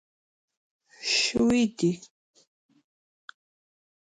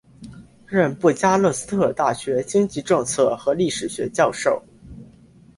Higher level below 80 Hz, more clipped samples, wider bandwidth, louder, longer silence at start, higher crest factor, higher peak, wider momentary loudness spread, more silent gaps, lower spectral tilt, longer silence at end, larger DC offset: second, -60 dBFS vs -54 dBFS; neither; about the same, 11 kHz vs 11.5 kHz; second, -25 LUFS vs -21 LUFS; first, 1 s vs 0.2 s; about the same, 18 dB vs 18 dB; second, -12 dBFS vs -4 dBFS; first, 11 LU vs 6 LU; neither; second, -3.5 dB/octave vs -5 dB/octave; first, 2 s vs 0.5 s; neither